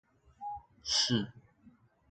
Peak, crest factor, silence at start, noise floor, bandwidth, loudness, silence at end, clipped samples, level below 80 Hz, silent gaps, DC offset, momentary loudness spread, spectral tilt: -18 dBFS; 20 dB; 0.4 s; -63 dBFS; 11 kHz; -32 LUFS; 0.4 s; under 0.1%; -66 dBFS; none; under 0.1%; 16 LU; -3 dB/octave